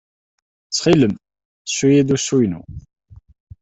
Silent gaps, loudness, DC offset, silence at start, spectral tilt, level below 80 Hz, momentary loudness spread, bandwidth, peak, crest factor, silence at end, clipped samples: 1.45-1.65 s; -17 LUFS; under 0.1%; 0.7 s; -5 dB/octave; -48 dBFS; 18 LU; 8.4 kHz; -2 dBFS; 18 dB; 0.85 s; under 0.1%